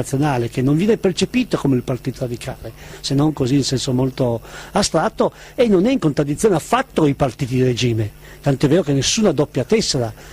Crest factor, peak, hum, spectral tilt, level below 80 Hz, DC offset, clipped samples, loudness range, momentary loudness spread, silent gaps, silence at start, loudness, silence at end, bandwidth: 14 dB; -4 dBFS; none; -5.5 dB/octave; -42 dBFS; under 0.1%; under 0.1%; 2 LU; 9 LU; none; 0 s; -18 LUFS; 0 s; 15.5 kHz